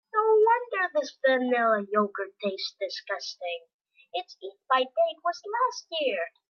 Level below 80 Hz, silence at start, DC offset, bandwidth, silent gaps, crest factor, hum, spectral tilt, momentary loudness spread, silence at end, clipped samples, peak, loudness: under -90 dBFS; 0.15 s; under 0.1%; 7 kHz; 3.73-3.85 s; 16 dB; none; -3.5 dB/octave; 13 LU; 0.2 s; under 0.1%; -12 dBFS; -27 LUFS